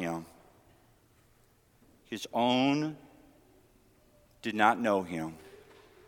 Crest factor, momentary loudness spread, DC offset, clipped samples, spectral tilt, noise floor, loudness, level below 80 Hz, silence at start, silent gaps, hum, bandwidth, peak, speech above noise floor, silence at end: 24 dB; 19 LU; under 0.1%; under 0.1%; -5 dB/octave; -65 dBFS; -30 LUFS; -68 dBFS; 0 s; none; none; 18 kHz; -10 dBFS; 36 dB; 0.5 s